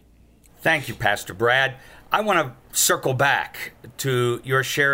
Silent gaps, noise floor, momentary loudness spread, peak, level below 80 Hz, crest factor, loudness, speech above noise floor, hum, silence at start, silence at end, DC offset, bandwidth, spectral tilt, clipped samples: none; -53 dBFS; 7 LU; -4 dBFS; -54 dBFS; 18 dB; -21 LUFS; 31 dB; none; 0.6 s; 0 s; under 0.1%; 16.5 kHz; -3 dB/octave; under 0.1%